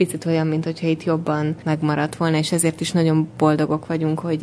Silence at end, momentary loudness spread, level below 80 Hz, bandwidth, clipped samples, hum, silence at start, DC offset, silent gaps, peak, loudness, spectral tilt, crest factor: 0 s; 4 LU; -58 dBFS; 11 kHz; under 0.1%; none; 0 s; under 0.1%; none; -4 dBFS; -21 LUFS; -6 dB/octave; 16 dB